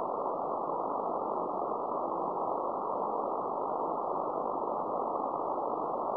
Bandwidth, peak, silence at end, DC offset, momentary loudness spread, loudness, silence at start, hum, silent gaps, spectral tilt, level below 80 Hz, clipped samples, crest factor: 5.4 kHz; -20 dBFS; 0 s; under 0.1%; 1 LU; -34 LUFS; 0 s; none; none; -11 dB/octave; -74 dBFS; under 0.1%; 14 dB